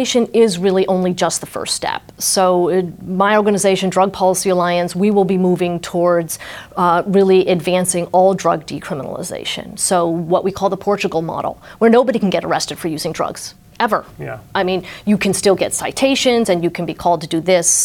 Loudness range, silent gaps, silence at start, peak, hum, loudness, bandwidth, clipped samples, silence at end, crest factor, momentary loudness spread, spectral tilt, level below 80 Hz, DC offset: 3 LU; none; 0 s; -2 dBFS; none; -16 LUFS; 18 kHz; under 0.1%; 0 s; 14 dB; 10 LU; -4 dB/octave; -50 dBFS; under 0.1%